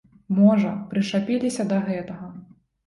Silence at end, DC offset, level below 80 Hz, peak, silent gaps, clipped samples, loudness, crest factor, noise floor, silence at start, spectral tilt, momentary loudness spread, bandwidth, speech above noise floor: 0.45 s; under 0.1%; -62 dBFS; -6 dBFS; none; under 0.1%; -22 LUFS; 16 dB; -46 dBFS; 0.3 s; -7 dB/octave; 17 LU; 11.5 kHz; 24 dB